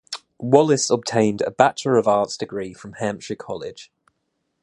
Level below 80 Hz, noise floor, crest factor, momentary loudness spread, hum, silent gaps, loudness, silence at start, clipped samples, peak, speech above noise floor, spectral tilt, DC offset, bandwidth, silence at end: -60 dBFS; -74 dBFS; 22 dB; 15 LU; none; none; -20 LUFS; 0.1 s; under 0.1%; 0 dBFS; 54 dB; -4.5 dB/octave; under 0.1%; 11.5 kHz; 0.8 s